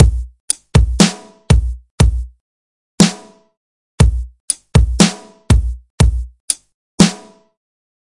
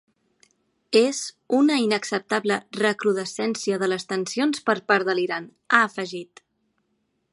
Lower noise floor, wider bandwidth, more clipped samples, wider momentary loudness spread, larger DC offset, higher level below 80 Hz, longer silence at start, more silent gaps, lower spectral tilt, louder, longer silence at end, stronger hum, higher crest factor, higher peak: first, under -90 dBFS vs -73 dBFS; about the same, 11.5 kHz vs 11.5 kHz; first, 0.1% vs under 0.1%; first, 14 LU vs 8 LU; neither; first, -20 dBFS vs -76 dBFS; second, 0 s vs 0.9 s; first, 0.40-0.48 s, 1.91-1.98 s, 2.40-2.98 s, 3.57-3.98 s, 4.40-4.48 s, 5.90-5.98 s, 6.40-6.48 s, 6.74-6.98 s vs none; first, -5 dB/octave vs -3.5 dB/octave; first, -15 LUFS vs -23 LUFS; second, 0.95 s vs 1.1 s; neither; second, 16 dB vs 22 dB; about the same, 0 dBFS vs -2 dBFS